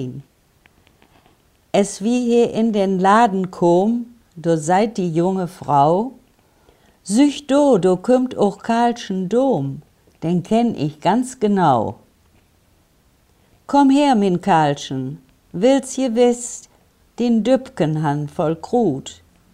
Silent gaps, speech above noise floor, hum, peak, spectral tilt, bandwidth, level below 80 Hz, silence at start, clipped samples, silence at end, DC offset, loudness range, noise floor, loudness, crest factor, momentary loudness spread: none; 40 dB; none; -2 dBFS; -6 dB/octave; 13 kHz; -56 dBFS; 0 s; under 0.1%; 0.4 s; under 0.1%; 3 LU; -57 dBFS; -18 LUFS; 18 dB; 13 LU